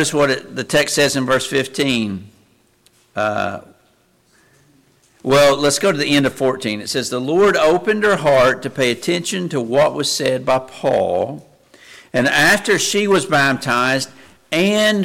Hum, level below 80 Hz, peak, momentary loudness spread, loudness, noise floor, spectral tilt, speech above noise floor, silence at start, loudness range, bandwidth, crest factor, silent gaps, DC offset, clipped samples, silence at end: none; -50 dBFS; -4 dBFS; 9 LU; -16 LUFS; -57 dBFS; -3.5 dB/octave; 41 dB; 0 s; 6 LU; 16.5 kHz; 12 dB; none; under 0.1%; under 0.1%; 0 s